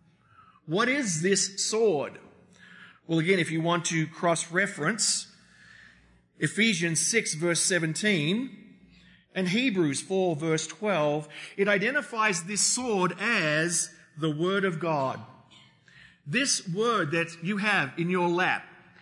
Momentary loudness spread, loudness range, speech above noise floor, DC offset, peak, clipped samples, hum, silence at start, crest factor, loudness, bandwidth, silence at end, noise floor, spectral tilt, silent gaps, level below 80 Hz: 8 LU; 3 LU; 33 dB; under 0.1%; -10 dBFS; under 0.1%; none; 0.65 s; 18 dB; -26 LUFS; 11 kHz; 0.3 s; -60 dBFS; -3.5 dB/octave; none; -74 dBFS